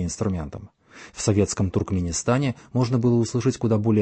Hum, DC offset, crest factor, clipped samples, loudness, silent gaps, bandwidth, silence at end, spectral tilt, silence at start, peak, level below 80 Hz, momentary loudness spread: none; under 0.1%; 16 dB; under 0.1%; -23 LUFS; none; 8.8 kHz; 0 s; -6 dB/octave; 0 s; -6 dBFS; -46 dBFS; 9 LU